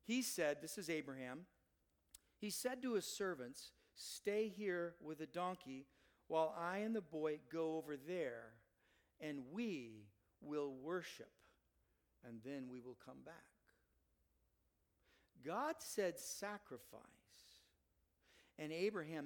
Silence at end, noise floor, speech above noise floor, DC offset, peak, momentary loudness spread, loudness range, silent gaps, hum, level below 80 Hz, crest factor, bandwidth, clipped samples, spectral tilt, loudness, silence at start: 0 s; -83 dBFS; 38 dB; under 0.1%; -26 dBFS; 18 LU; 10 LU; none; none; -84 dBFS; 22 dB; 19 kHz; under 0.1%; -4 dB/octave; -46 LUFS; 0.05 s